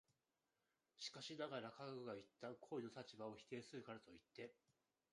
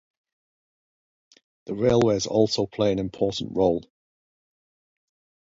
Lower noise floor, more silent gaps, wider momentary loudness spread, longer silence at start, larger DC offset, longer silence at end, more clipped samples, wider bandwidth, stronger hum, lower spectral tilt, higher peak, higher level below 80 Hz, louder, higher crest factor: about the same, under -90 dBFS vs under -90 dBFS; neither; first, 9 LU vs 6 LU; second, 1 s vs 1.65 s; neither; second, 0.6 s vs 1.6 s; neither; first, 11 kHz vs 7.8 kHz; neither; about the same, -4.5 dB/octave vs -5.5 dB/octave; second, -36 dBFS vs -6 dBFS; second, under -90 dBFS vs -54 dBFS; second, -55 LUFS vs -23 LUFS; about the same, 20 dB vs 20 dB